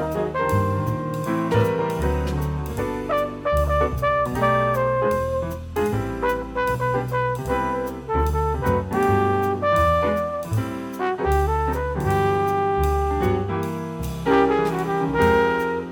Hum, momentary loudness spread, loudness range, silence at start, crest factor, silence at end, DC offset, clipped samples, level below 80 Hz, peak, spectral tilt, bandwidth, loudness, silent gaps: none; 7 LU; 2 LU; 0 s; 18 dB; 0 s; under 0.1%; under 0.1%; -32 dBFS; -4 dBFS; -7 dB/octave; 19.5 kHz; -22 LUFS; none